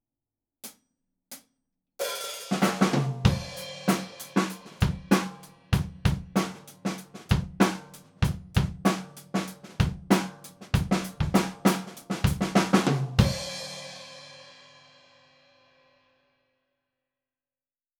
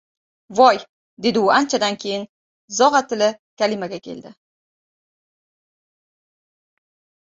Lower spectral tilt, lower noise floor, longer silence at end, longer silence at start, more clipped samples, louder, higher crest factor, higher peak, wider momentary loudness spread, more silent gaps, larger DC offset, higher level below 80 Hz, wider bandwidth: first, -5.5 dB/octave vs -3 dB/octave; about the same, under -90 dBFS vs under -90 dBFS; first, 3.5 s vs 2.9 s; first, 0.65 s vs 0.5 s; neither; second, -28 LUFS vs -19 LUFS; about the same, 24 dB vs 20 dB; second, -6 dBFS vs -2 dBFS; first, 19 LU vs 16 LU; second, none vs 0.89-1.17 s, 2.29-2.68 s, 3.39-3.57 s; neither; first, -42 dBFS vs -66 dBFS; first, 19.5 kHz vs 7.8 kHz